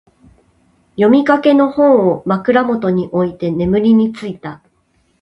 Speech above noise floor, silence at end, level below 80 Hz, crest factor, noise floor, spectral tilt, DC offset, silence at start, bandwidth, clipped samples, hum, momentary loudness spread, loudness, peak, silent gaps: 46 dB; 0.65 s; -48 dBFS; 14 dB; -59 dBFS; -8.5 dB/octave; under 0.1%; 1 s; 7.8 kHz; under 0.1%; none; 15 LU; -13 LUFS; 0 dBFS; none